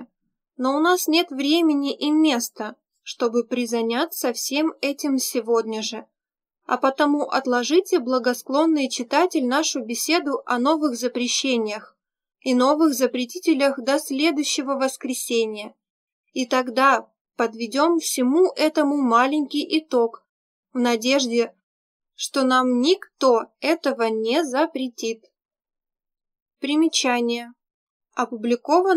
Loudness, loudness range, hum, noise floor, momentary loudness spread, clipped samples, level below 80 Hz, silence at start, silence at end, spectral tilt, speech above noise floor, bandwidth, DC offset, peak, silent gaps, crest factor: -21 LUFS; 4 LU; none; -75 dBFS; 9 LU; under 0.1%; -86 dBFS; 0 s; 0 s; -2 dB/octave; 54 dB; 16 kHz; under 0.1%; -4 dBFS; 15.90-16.24 s, 17.21-17.25 s, 20.29-20.63 s, 21.63-22.00 s, 26.42-26.46 s, 27.74-28.00 s; 20 dB